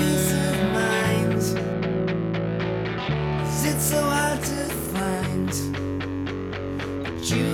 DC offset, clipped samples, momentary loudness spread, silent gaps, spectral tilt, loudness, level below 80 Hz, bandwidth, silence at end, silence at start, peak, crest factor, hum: under 0.1%; under 0.1%; 8 LU; none; -5 dB/octave; -25 LUFS; -42 dBFS; 18 kHz; 0 s; 0 s; -10 dBFS; 14 dB; none